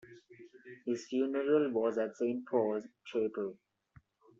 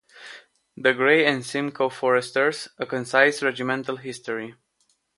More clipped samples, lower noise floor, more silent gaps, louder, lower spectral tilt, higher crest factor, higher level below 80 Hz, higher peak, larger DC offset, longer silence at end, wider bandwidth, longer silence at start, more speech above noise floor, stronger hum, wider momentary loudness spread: neither; second, -65 dBFS vs -69 dBFS; neither; second, -34 LUFS vs -23 LUFS; first, -5.5 dB/octave vs -4 dB/octave; about the same, 18 dB vs 22 dB; second, -80 dBFS vs -72 dBFS; second, -18 dBFS vs -2 dBFS; neither; first, 0.85 s vs 0.65 s; second, 7.6 kHz vs 11.5 kHz; about the same, 0.05 s vs 0.15 s; second, 32 dB vs 46 dB; neither; about the same, 12 LU vs 14 LU